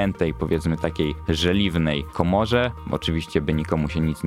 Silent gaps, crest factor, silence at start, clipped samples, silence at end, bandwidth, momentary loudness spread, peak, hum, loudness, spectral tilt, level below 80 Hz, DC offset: none; 20 dB; 0 s; under 0.1%; 0 s; 15 kHz; 5 LU; -2 dBFS; none; -23 LUFS; -6.5 dB/octave; -36 dBFS; under 0.1%